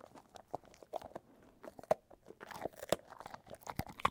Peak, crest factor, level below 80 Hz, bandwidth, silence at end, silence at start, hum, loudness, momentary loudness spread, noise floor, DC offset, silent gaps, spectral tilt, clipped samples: -14 dBFS; 30 dB; -66 dBFS; 18 kHz; 0 s; 0.15 s; none; -44 LUFS; 17 LU; -60 dBFS; under 0.1%; none; -4 dB/octave; under 0.1%